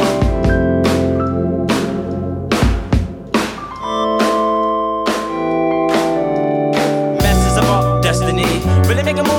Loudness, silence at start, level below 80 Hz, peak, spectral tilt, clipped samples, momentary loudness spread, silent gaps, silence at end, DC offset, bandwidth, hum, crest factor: -16 LUFS; 0 s; -26 dBFS; 0 dBFS; -6 dB/octave; under 0.1%; 5 LU; none; 0 s; under 0.1%; 18.5 kHz; none; 14 dB